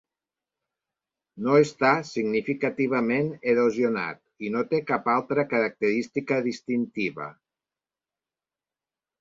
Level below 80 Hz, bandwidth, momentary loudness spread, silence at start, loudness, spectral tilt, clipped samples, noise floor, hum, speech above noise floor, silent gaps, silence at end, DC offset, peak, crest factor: -70 dBFS; 7.8 kHz; 9 LU; 1.35 s; -25 LUFS; -6.5 dB/octave; under 0.1%; under -90 dBFS; none; over 65 dB; none; 1.9 s; under 0.1%; -6 dBFS; 20 dB